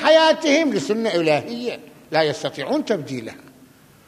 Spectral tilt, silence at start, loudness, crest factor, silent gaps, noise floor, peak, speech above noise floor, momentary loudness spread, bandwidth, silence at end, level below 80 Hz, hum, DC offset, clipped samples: -4 dB/octave; 0 s; -20 LUFS; 18 dB; none; -50 dBFS; -4 dBFS; 29 dB; 15 LU; 14.5 kHz; 0.7 s; -68 dBFS; none; under 0.1%; under 0.1%